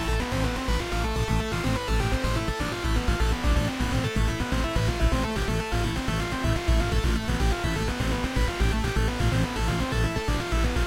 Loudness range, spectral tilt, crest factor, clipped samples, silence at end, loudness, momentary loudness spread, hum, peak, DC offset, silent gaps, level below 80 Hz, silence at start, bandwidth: 0 LU; -5.5 dB/octave; 14 dB; under 0.1%; 0 s; -26 LUFS; 2 LU; none; -12 dBFS; under 0.1%; none; -28 dBFS; 0 s; 16 kHz